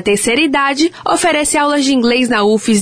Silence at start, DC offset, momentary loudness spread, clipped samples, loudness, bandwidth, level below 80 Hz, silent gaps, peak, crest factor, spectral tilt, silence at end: 0 s; under 0.1%; 2 LU; under 0.1%; -12 LUFS; 11 kHz; -46 dBFS; none; -2 dBFS; 10 dB; -3 dB/octave; 0 s